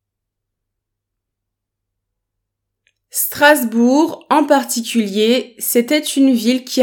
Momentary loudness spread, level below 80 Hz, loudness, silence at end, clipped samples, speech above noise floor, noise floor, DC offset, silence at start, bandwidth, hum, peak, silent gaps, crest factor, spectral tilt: 7 LU; -70 dBFS; -15 LUFS; 0 s; under 0.1%; 65 dB; -79 dBFS; under 0.1%; 3.15 s; 19 kHz; none; 0 dBFS; none; 18 dB; -3 dB/octave